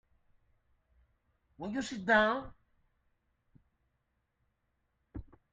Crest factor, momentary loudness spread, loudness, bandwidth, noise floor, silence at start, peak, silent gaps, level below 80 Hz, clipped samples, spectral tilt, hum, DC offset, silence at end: 24 dB; 23 LU; -31 LUFS; 9 kHz; -80 dBFS; 1.6 s; -14 dBFS; none; -62 dBFS; under 0.1%; -4.5 dB/octave; none; under 0.1%; 0.3 s